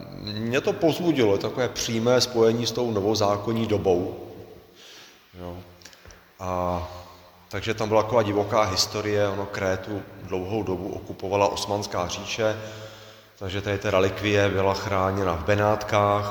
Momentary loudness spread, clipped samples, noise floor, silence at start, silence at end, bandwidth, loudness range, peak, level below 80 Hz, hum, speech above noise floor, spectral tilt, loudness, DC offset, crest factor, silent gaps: 17 LU; under 0.1%; -49 dBFS; 0 s; 0 s; over 20 kHz; 7 LU; -6 dBFS; -52 dBFS; none; 25 dB; -5 dB/octave; -24 LUFS; under 0.1%; 18 dB; none